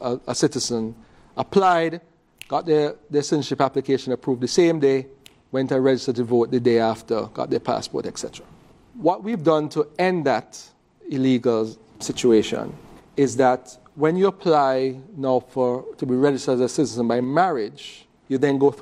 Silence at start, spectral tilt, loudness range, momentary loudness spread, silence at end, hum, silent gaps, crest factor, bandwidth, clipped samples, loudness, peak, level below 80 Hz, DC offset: 0 s; -5.5 dB/octave; 3 LU; 12 LU; 0 s; none; none; 18 dB; 13 kHz; under 0.1%; -22 LUFS; -4 dBFS; -60 dBFS; under 0.1%